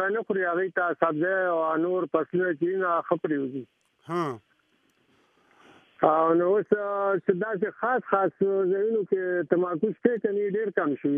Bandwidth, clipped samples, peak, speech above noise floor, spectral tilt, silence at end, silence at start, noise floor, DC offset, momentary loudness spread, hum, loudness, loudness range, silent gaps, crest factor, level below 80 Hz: 6 kHz; under 0.1%; -6 dBFS; 42 dB; -8.5 dB/octave; 0 s; 0 s; -68 dBFS; under 0.1%; 6 LU; none; -26 LUFS; 5 LU; none; 20 dB; -78 dBFS